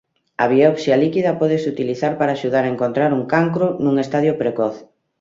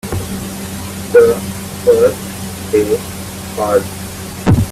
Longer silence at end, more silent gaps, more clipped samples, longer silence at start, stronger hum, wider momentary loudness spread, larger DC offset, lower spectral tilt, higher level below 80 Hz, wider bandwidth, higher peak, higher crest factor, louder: first, 0.35 s vs 0 s; neither; neither; first, 0.4 s vs 0.05 s; neither; second, 7 LU vs 14 LU; neither; first, -7.5 dB/octave vs -5.5 dB/octave; second, -60 dBFS vs -36 dBFS; second, 7.8 kHz vs 16 kHz; about the same, -2 dBFS vs 0 dBFS; about the same, 16 dB vs 14 dB; about the same, -18 LUFS vs -16 LUFS